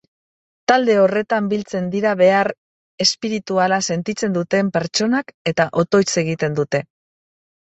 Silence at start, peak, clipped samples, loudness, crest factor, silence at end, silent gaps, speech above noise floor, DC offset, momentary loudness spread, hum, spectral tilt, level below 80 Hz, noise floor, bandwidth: 0.7 s; -2 dBFS; under 0.1%; -18 LUFS; 16 dB; 0.8 s; 2.58-2.98 s, 5.34-5.45 s; over 72 dB; under 0.1%; 8 LU; none; -4.5 dB/octave; -60 dBFS; under -90 dBFS; 8.2 kHz